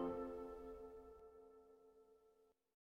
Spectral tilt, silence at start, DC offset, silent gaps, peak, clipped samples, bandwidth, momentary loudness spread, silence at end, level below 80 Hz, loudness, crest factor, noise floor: -8 dB/octave; 0 s; under 0.1%; none; -34 dBFS; under 0.1%; 16 kHz; 20 LU; 0.3 s; -70 dBFS; -53 LUFS; 20 dB; -76 dBFS